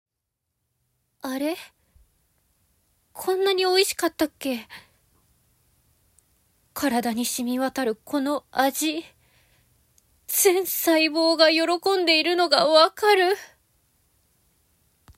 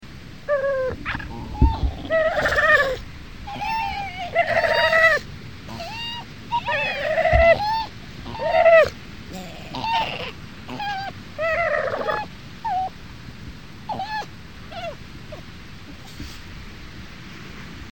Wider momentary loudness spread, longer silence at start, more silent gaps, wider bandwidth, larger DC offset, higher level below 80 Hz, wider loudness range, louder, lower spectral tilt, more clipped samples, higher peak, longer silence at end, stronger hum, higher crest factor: second, 13 LU vs 23 LU; first, 1.25 s vs 0 s; neither; about the same, 16 kHz vs 17.5 kHz; second, under 0.1% vs 0.6%; second, -66 dBFS vs -34 dBFS; second, 11 LU vs 15 LU; about the same, -22 LUFS vs -21 LUFS; second, -1.5 dB/octave vs -5 dB/octave; neither; about the same, -4 dBFS vs -4 dBFS; first, 1.7 s vs 0 s; neither; about the same, 20 dB vs 20 dB